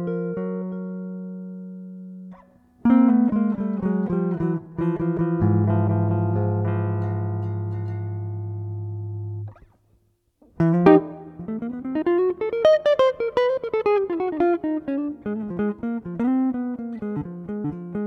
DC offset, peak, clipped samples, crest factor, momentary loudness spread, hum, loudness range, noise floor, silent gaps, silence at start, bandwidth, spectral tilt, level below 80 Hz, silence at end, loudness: under 0.1%; -2 dBFS; under 0.1%; 22 dB; 16 LU; none; 6 LU; -64 dBFS; none; 0 s; 6.2 kHz; -9.5 dB/octave; -54 dBFS; 0 s; -23 LUFS